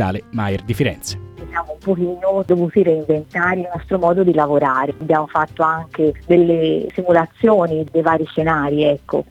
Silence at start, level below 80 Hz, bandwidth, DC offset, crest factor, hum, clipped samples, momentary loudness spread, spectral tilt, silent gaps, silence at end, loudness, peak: 0 s; -44 dBFS; 14.5 kHz; under 0.1%; 16 dB; none; under 0.1%; 8 LU; -7 dB/octave; none; 0.05 s; -17 LUFS; -2 dBFS